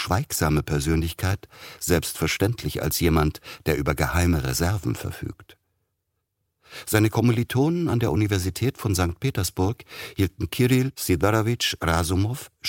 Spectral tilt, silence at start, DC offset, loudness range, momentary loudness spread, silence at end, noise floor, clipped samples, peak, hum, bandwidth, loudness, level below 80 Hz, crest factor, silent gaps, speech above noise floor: -5 dB/octave; 0 s; under 0.1%; 3 LU; 10 LU; 0 s; -78 dBFS; under 0.1%; -4 dBFS; none; 17 kHz; -24 LUFS; -38 dBFS; 20 dB; none; 54 dB